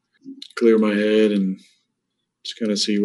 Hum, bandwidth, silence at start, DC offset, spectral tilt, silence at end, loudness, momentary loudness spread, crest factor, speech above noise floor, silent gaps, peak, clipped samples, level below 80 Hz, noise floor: none; 11.5 kHz; 0.25 s; under 0.1%; -5 dB/octave; 0 s; -19 LUFS; 18 LU; 16 dB; 59 dB; none; -4 dBFS; under 0.1%; -78 dBFS; -77 dBFS